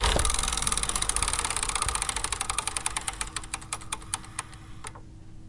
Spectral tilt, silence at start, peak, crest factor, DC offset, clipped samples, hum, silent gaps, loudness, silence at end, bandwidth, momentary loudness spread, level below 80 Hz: -1 dB/octave; 0 s; -8 dBFS; 22 dB; under 0.1%; under 0.1%; none; none; -28 LUFS; 0 s; 11.5 kHz; 17 LU; -38 dBFS